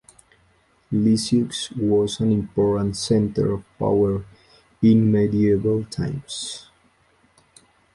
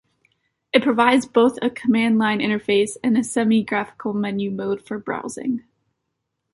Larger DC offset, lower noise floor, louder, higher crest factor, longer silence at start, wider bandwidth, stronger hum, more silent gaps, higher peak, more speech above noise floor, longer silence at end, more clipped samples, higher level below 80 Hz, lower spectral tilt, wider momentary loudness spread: neither; second, -60 dBFS vs -77 dBFS; about the same, -21 LUFS vs -20 LUFS; about the same, 16 dB vs 20 dB; first, 0.9 s vs 0.75 s; about the same, 11.5 kHz vs 11.5 kHz; neither; neither; second, -6 dBFS vs -2 dBFS; second, 40 dB vs 57 dB; first, 1.35 s vs 0.95 s; neither; first, -48 dBFS vs -62 dBFS; first, -6.5 dB/octave vs -5 dB/octave; about the same, 11 LU vs 11 LU